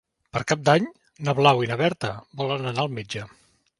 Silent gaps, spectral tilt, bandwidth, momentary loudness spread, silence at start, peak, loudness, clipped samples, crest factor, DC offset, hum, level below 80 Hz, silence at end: none; -5.5 dB/octave; 11.5 kHz; 14 LU; 0.35 s; -2 dBFS; -24 LUFS; under 0.1%; 22 dB; under 0.1%; none; -60 dBFS; 0.55 s